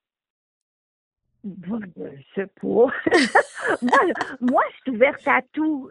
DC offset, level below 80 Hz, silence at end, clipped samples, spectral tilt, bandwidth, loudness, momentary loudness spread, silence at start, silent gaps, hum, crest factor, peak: under 0.1%; -64 dBFS; 0 s; under 0.1%; -4.5 dB/octave; 11.5 kHz; -21 LUFS; 17 LU; 1.45 s; none; none; 20 dB; -4 dBFS